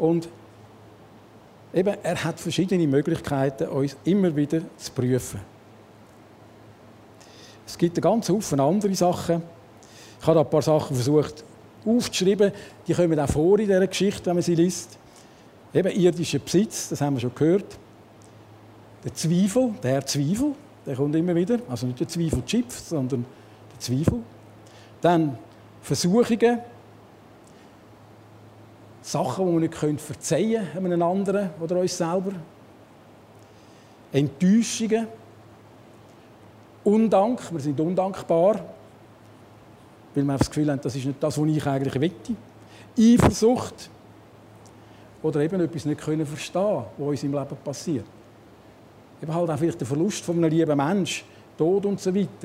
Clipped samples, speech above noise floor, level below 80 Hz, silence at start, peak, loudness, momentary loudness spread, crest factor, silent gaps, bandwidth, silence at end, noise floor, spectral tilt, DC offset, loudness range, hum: under 0.1%; 27 dB; -52 dBFS; 0 s; -4 dBFS; -24 LUFS; 12 LU; 20 dB; none; 16 kHz; 0 s; -50 dBFS; -6 dB/octave; under 0.1%; 6 LU; none